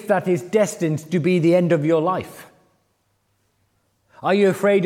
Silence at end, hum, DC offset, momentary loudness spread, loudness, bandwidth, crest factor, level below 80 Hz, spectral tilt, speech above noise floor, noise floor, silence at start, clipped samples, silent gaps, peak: 0 s; none; under 0.1%; 8 LU; -19 LUFS; 16 kHz; 16 dB; -70 dBFS; -6.5 dB/octave; 49 dB; -67 dBFS; 0 s; under 0.1%; none; -6 dBFS